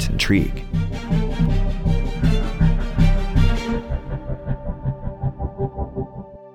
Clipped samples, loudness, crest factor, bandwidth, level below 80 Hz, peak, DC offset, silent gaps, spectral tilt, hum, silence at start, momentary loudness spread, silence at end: under 0.1%; -23 LUFS; 16 dB; 10 kHz; -22 dBFS; -4 dBFS; under 0.1%; none; -6.5 dB/octave; none; 0 s; 10 LU; 0.05 s